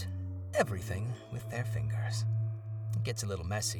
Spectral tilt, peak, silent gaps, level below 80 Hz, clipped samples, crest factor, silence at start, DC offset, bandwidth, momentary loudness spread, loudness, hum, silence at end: -5 dB/octave; -14 dBFS; none; -58 dBFS; under 0.1%; 20 dB; 0 s; under 0.1%; 17 kHz; 7 LU; -35 LUFS; none; 0 s